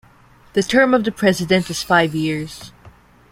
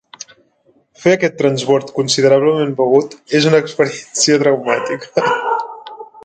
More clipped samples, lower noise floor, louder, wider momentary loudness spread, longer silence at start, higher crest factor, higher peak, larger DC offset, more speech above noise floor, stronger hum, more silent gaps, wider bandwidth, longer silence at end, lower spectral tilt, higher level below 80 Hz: neither; second, -49 dBFS vs -56 dBFS; about the same, -17 LUFS vs -15 LUFS; second, 11 LU vs 14 LU; first, 0.55 s vs 0.2 s; about the same, 18 dB vs 14 dB; about the same, -2 dBFS vs 0 dBFS; neither; second, 32 dB vs 42 dB; neither; neither; first, 16.5 kHz vs 9.4 kHz; first, 0.45 s vs 0.05 s; about the same, -5 dB/octave vs -4 dB/octave; first, -50 dBFS vs -62 dBFS